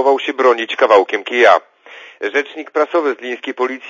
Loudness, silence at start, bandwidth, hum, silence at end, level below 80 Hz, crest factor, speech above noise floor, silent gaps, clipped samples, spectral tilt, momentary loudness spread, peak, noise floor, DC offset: -15 LUFS; 0 s; 7.4 kHz; none; 0 s; -68 dBFS; 16 dB; 25 dB; none; under 0.1%; -2.5 dB/octave; 10 LU; 0 dBFS; -39 dBFS; under 0.1%